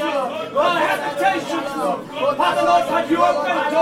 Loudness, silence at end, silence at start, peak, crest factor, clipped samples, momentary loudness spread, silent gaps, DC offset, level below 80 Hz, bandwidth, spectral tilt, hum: -19 LUFS; 0 s; 0 s; -4 dBFS; 16 dB; under 0.1%; 6 LU; none; under 0.1%; -58 dBFS; 16 kHz; -4 dB/octave; none